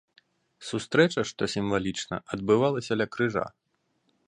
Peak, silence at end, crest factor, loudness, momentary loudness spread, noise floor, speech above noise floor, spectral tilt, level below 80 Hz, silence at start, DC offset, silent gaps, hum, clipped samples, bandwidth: -6 dBFS; 0.8 s; 22 dB; -27 LUFS; 11 LU; -73 dBFS; 46 dB; -5 dB/octave; -58 dBFS; 0.6 s; under 0.1%; none; none; under 0.1%; 11 kHz